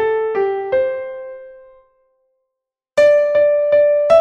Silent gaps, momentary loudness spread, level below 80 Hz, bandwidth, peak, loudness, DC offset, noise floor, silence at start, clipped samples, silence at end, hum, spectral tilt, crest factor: none; 18 LU; -58 dBFS; 8.8 kHz; -2 dBFS; -15 LUFS; under 0.1%; -81 dBFS; 0 s; under 0.1%; 0 s; none; -4.5 dB/octave; 14 dB